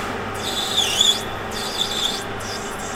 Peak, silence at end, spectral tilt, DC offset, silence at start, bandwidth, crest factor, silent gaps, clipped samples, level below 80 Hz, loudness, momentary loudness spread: -2 dBFS; 0 s; -1.5 dB/octave; under 0.1%; 0 s; 17.5 kHz; 20 dB; none; under 0.1%; -44 dBFS; -21 LUFS; 12 LU